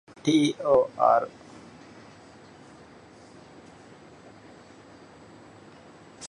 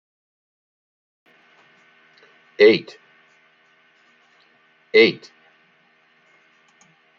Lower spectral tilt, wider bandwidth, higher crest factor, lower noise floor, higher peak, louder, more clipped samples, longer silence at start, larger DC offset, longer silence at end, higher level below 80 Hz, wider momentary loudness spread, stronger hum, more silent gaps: about the same, -5.5 dB/octave vs -5.5 dB/octave; first, 11 kHz vs 6.8 kHz; about the same, 22 dB vs 22 dB; second, -50 dBFS vs -59 dBFS; second, -8 dBFS vs -2 dBFS; second, -23 LUFS vs -16 LUFS; neither; second, 0.25 s vs 2.6 s; neither; second, 0 s vs 2.05 s; first, -66 dBFS vs -76 dBFS; about the same, 28 LU vs 27 LU; neither; neither